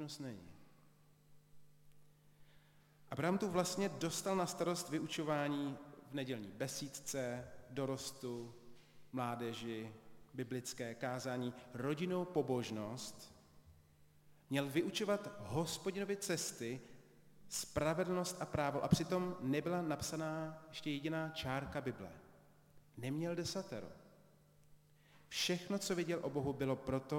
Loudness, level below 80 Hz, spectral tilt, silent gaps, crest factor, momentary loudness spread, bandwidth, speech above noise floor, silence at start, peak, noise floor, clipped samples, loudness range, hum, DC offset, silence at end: -41 LUFS; -68 dBFS; -4.5 dB/octave; none; 24 dB; 11 LU; 16.5 kHz; 27 dB; 0 s; -18 dBFS; -68 dBFS; under 0.1%; 6 LU; none; under 0.1%; 0 s